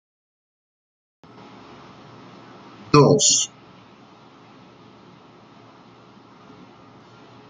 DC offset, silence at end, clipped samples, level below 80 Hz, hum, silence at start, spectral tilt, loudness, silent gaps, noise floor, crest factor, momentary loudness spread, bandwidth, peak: under 0.1%; 4.05 s; under 0.1%; -60 dBFS; none; 2.95 s; -3.5 dB/octave; -16 LUFS; none; -48 dBFS; 24 dB; 30 LU; 9.6 kHz; -2 dBFS